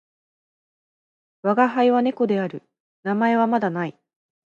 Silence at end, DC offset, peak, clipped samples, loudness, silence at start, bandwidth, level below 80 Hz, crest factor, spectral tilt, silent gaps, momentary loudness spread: 0.6 s; under 0.1%; -4 dBFS; under 0.1%; -21 LUFS; 1.45 s; 7 kHz; -76 dBFS; 20 dB; -8 dB/octave; 2.80-3.03 s; 13 LU